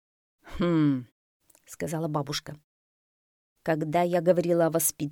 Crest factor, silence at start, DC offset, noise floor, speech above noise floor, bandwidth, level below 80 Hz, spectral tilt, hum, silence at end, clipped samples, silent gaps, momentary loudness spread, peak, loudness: 20 dB; 0.45 s; under 0.1%; under -90 dBFS; over 64 dB; 19.5 kHz; -54 dBFS; -5.5 dB/octave; none; 0 s; under 0.1%; 1.12-1.40 s, 2.64-3.56 s; 13 LU; -10 dBFS; -27 LUFS